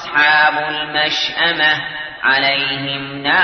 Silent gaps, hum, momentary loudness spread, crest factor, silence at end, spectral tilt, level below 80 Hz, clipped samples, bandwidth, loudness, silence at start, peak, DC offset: none; none; 9 LU; 14 dB; 0 s; -3 dB/octave; -54 dBFS; under 0.1%; 6.6 kHz; -15 LUFS; 0 s; -2 dBFS; under 0.1%